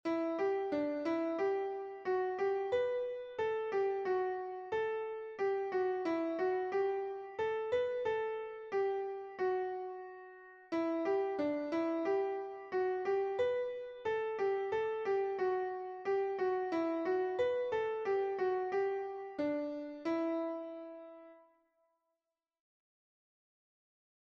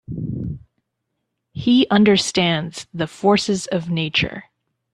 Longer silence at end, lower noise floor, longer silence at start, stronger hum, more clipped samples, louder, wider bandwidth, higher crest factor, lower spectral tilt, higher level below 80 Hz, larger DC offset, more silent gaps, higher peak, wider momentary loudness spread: first, 3 s vs 0.5 s; first, -90 dBFS vs -76 dBFS; about the same, 0.05 s vs 0.1 s; neither; neither; second, -36 LUFS vs -19 LUFS; second, 6.8 kHz vs 11 kHz; about the same, 14 dB vs 18 dB; about the same, -6 dB/octave vs -5 dB/octave; second, -76 dBFS vs -50 dBFS; neither; neither; second, -24 dBFS vs -2 dBFS; second, 7 LU vs 16 LU